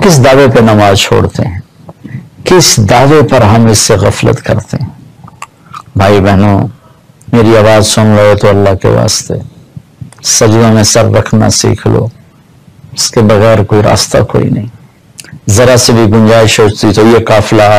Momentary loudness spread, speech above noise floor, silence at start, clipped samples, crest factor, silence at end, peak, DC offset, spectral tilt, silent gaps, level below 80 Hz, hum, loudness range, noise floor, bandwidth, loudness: 14 LU; 34 dB; 0 s; 0.2%; 6 dB; 0 s; 0 dBFS; under 0.1%; -5 dB/octave; none; -30 dBFS; none; 3 LU; -39 dBFS; 15.5 kHz; -6 LUFS